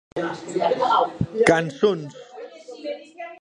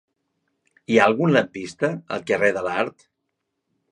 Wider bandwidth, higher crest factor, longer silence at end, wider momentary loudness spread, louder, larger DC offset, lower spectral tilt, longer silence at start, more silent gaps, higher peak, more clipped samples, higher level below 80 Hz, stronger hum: about the same, 11 kHz vs 11 kHz; about the same, 22 dB vs 22 dB; second, 0.05 s vs 1 s; first, 21 LU vs 11 LU; about the same, -21 LUFS vs -21 LUFS; neither; about the same, -5.5 dB/octave vs -6 dB/octave; second, 0.15 s vs 0.9 s; neither; about the same, -2 dBFS vs -2 dBFS; neither; first, -52 dBFS vs -64 dBFS; neither